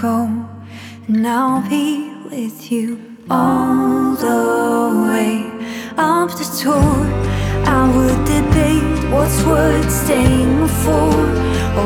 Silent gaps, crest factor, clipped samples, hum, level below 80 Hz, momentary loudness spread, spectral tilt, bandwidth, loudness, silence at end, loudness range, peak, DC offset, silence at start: none; 14 dB; under 0.1%; none; -26 dBFS; 12 LU; -6 dB/octave; 19 kHz; -16 LUFS; 0 s; 4 LU; -2 dBFS; under 0.1%; 0 s